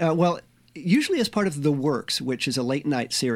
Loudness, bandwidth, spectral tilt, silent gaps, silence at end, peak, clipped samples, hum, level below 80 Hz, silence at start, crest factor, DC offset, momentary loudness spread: -24 LUFS; 16 kHz; -5 dB/octave; none; 0 s; -8 dBFS; under 0.1%; none; -64 dBFS; 0 s; 16 dB; under 0.1%; 4 LU